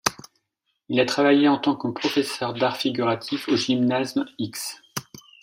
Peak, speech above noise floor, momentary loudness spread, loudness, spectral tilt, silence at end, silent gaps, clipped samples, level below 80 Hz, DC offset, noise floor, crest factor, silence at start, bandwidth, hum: -2 dBFS; 54 dB; 12 LU; -23 LUFS; -4 dB/octave; 0.4 s; none; under 0.1%; -66 dBFS; under 0.1%; -76 dBFS; 22 dB; 0.05 s; 16 kHz; none